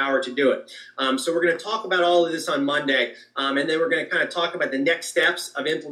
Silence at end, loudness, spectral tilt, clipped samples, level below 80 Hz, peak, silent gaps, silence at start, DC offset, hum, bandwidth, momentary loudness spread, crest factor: 0 s; -22 LUFS; -3 dB/octave; under 0.1%; -88 dBFS; -8 dBFS; none; 0 s; under 0.1%; none; 13.5 kHz; 6 LU; 16 dB